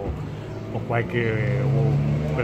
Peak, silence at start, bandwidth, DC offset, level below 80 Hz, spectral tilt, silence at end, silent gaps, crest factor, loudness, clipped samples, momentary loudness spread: -8 dBFS; 0 s; 8 kHz; under 0.1%; -40 dBFS; -8.5 dB/octave; 0 s; none; 16 dB; -24 LUFS; under 0.1%; 11 LU